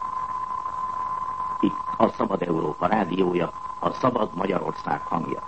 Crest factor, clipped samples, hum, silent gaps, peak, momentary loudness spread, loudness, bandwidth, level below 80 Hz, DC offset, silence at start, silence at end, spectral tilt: 22 dB; under 0.1%; none; none; -4 dBFS; 6 LU; -26 LUFS; 8.6 kHz; -56 dBFS; 0.4%; 0 s; 0 s; -7.5 dB/octave